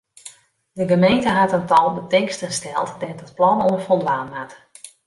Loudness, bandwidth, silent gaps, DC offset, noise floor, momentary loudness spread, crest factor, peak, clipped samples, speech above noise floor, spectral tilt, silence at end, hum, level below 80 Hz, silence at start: -19 LUFS; 11.5 kHz; none; under 0.1%; -45 dBFS; 16 LU; 16 dB; -4 dBFS; under 0.1%; 26 dB; -5 dB/octave; 0.2 s; none; -56 dBFS; 0.25 s